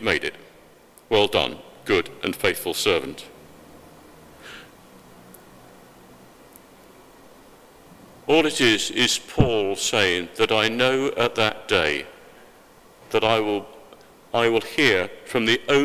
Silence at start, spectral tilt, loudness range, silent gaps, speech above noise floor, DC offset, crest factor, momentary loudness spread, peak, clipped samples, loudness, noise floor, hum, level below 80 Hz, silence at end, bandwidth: 0 s; -3.5 dB/octave; 8 LU; none; 30 dB; under 0.1%; 24 dB; 17 LU; 0 dBFS; under 0.1%; -21 LUFS; -51 dBFS; none; -48 dBFS; 0 s; 16 kHz